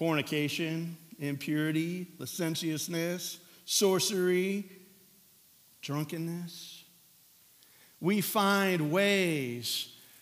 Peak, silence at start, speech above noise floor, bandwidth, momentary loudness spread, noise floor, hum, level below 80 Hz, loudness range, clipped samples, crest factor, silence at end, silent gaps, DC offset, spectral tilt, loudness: -12 dBFS; 0 s; 31 dB; 16 kHz; 15 LU; -61 dBFS; none; -88 dBFS; 9 LU; under 0.1%; 20 dB; 0.25 s; none; under 0.1%; -4 dB/octave; -31 LUFS